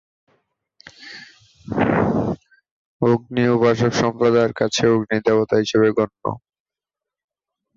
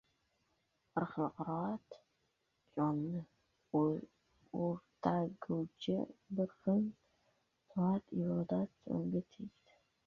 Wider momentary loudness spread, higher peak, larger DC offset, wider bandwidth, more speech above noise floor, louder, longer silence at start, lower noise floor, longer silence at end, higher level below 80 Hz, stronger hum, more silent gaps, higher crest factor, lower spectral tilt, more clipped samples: first, 16 LU vs 10 LU; first, -4 dBFS vs -18 dBFS; neither; first, 7.6 kHz vs 6.8 kHz; first, 70 dB vs 44 dB; first, -19 LUFS vs -39 LUFS; about the same, 1 s vs 0.95 s; first, -87 dBFS vs -81 dBFS; first, 1.4 s vs 0.55 s; first, -50 dBFS vs -74 dBFS; neither; first, 2.71-3.00 s vs none; second, 16 dB vs 22 dB; second, -6 dB/octave vs -8 dB/octave; neither